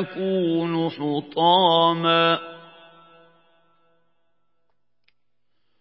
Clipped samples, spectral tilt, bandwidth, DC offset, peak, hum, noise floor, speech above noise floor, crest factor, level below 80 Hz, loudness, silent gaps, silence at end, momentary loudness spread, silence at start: under 0.1%; -10 dB/octave; 5.8 kHz; under 0.1%; -6 dBFS; none; -79 dBFS; 59 dB; 20 dB; -78 dBFS; -20 LUFS; none; 3.2 s; 10 LU; 0 s